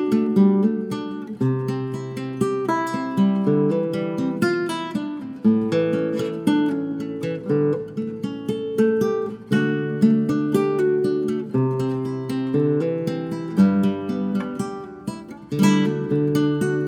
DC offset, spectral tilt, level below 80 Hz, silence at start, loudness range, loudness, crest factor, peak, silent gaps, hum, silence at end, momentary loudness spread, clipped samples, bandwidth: under 0.1%; -7.5 dB/octave; -60 dBFS; 0 s; 2 LU; -22 LUFS; 16 dB; -6 dBFS; none; none; 0 s; 10 LU; under 0.1%; 15 kHz